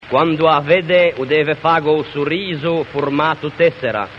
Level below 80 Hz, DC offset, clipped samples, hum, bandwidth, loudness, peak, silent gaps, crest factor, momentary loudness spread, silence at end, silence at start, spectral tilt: -52 dBFS; under 0.1%; under 0.1%; none; 6.8 kHz; -16 LUFS; 0 dBFS; none; 14 dB; 6 LU; 0 s; 0 s; -7.5 dB/octave